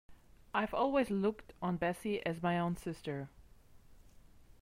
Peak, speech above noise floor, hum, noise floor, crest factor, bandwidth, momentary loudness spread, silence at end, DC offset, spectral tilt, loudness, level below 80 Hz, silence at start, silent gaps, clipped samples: -20 dBFS; 24 dB; none; -59 dBFS; 18 dB; 16 kHz; 10 LU; 0.45 s; under 0.1%; -7 dB/octave; -36 LUFS; -62 dBFS; 0.1 s; none; under 0.1%